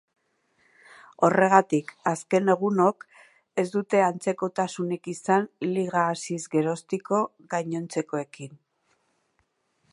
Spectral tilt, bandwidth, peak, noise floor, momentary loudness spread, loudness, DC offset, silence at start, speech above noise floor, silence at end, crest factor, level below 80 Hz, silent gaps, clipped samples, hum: -6 dB/octave; 11.5 kHz; -2 dBFS; -72 dBFS; 11 LU; -25 LUFS; under 0.1%; 1.2 s; 47 dB; 1.35 s; 24 dB; -76 dBFS; none; under 0.1%; none